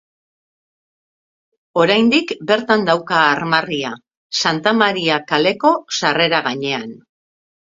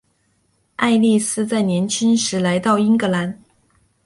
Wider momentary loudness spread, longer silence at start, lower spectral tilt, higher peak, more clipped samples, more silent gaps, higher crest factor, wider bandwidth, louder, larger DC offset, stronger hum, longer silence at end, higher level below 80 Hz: about the same, 9 LU vs 8 LU; first, 1.75 s vs 0.8 s; about the same, -4 dB/octave vs -4.5 dB/octave; first, 0 dBFS vs -4 dBFS; neither; first, 4.17-4.30 s vs none; about the same, 18 dB vs 16 dB; second, 7.8 kHz vs 11.5 kHz; about the same, -16 LUFS vs -18 LUFS; neither; neither; about the same, 0.75 s vs 0.7 s; about the same, -62 dBFS vs -60 dBFS